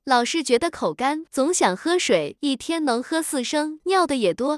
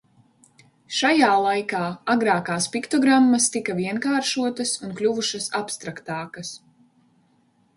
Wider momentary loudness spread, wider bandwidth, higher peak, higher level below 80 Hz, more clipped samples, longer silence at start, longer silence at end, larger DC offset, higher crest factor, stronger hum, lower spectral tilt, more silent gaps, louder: second, 5 LU vs 14 LU; about the same, 12 kHz vs 11.5 kHz; about the same, -6 dBFS vs -4 dBFS; first, -62 dBFS vs -68 dBFS; neither; second, 0.05 s vs 0.9 s; second, 0 s vs 1.2 s; neither; about the same, 16 dB vs 18 dB; neither; about the same, -3 dB/octave vs -3 dB/octave; neither; about the same, -22 LUFS vs -22 LUFS